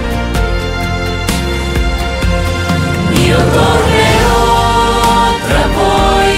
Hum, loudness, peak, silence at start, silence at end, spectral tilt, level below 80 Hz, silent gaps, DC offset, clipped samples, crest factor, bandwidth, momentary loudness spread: none; -11 LUFS; 0 dBFS; 0 s; 0 s; -5 dB/octave; -18 dBFS; none; under 0.1%; under 0.1%; 10 dB; 16.5 kHz; 6 LU